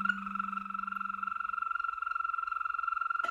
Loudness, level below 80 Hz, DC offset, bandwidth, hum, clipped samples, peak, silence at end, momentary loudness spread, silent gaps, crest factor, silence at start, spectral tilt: -34 LUFS; -70 dBFS; under 0.1%; 9.4 kHz; none; under 0.1%; -18 dBFS; 0 s; 4 LU; none; 18 dB; 0 s; -4.5 dB/octave